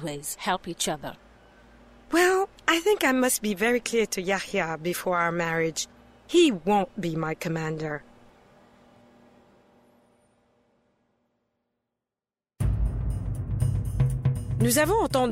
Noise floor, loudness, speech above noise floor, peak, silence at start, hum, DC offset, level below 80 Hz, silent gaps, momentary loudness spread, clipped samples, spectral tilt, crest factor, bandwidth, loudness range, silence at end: under -90 dBFS; -26 LUFS; over 65 dB; -8 dBFS; 0 s; none; under 0.1%; -40 dBFS; none; 10 LU; under 0.1%; -4.5 dB/octave; 20 dB; 16 kHz; 12 LU; 0 s